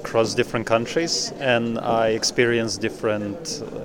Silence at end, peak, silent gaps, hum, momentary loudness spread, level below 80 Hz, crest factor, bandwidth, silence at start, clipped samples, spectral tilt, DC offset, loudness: 0 s; -6 dBFS; none; none; 7 LU; -52 dBFS; 18 dB; 18 kHz; 0 s; under 0.1%; -3.5 dB/octave; under 0.1%; -22 LUFS